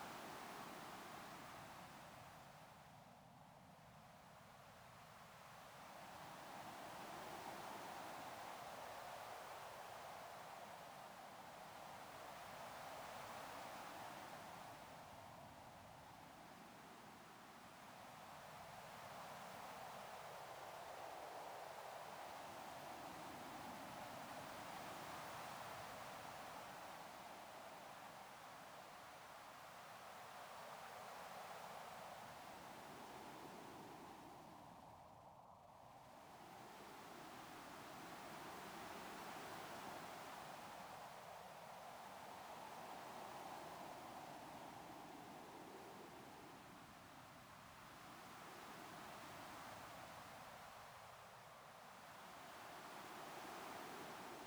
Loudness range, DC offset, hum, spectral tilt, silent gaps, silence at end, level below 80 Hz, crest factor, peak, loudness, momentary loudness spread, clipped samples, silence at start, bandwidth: 6 LU; under 0.1%; none; -3 dB/octave; none; 0 s; -82 dBFS; 16 dB; -40 dBFS; -56 LUFS; 7 LU; under 0.1%; 0 s; over 20 kHz